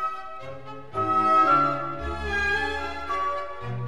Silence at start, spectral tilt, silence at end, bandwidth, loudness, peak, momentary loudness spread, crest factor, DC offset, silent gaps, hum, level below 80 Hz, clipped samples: 0 s; -5.5 dB/octave; 0 s; 11.5 kHz; -24 LUFS; -10 dBFS; 19 LU; 16 dB; 1%; none; none; -44 dBFS; under 0.1%